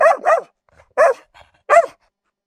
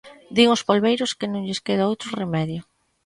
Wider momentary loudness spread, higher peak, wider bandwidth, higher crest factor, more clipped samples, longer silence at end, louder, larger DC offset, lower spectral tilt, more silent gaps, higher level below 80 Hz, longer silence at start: first, 14 LU vs 10 LU; about the same, 0 dBFS vs -2 dBFS; about the same, 12 kHz vs 11.5 kHz; about the same, 18 dB vs 20 dB; neither; first, 0.6 s vs 0.45 s; first, -16 LUFS vs -22 LUFS; neither; second, -2 dB/octave vs -5 dB/octave; neither; about the same, -62 dBFS vs -60 dBFS; about the same, 0 s vs 0.05 s